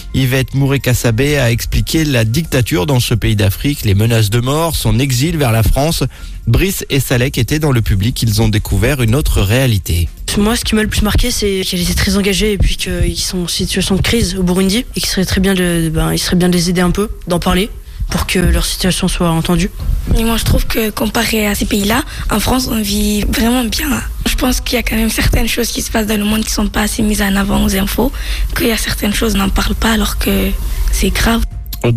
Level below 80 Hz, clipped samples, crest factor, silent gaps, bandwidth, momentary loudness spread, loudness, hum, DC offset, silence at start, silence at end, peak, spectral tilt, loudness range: -20 dBFS; under 0.1%; 10 dB; none; 15.5 kHz; 4 LU; -14 LUFS; none; under 0.1%; 0 s; 0 s; -4 dBFS; -4.5 dB/octave; 1 LU